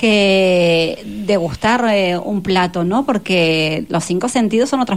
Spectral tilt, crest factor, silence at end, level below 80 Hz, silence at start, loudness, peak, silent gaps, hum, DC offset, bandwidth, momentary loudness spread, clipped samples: -5 dB/octave; 12 dB; 0 s; -46 dBFS; 0 s; -15 LUFS; -4 dBFS; none; none; 0.5%; 15.5 kHz; 7 LU; under 0.1%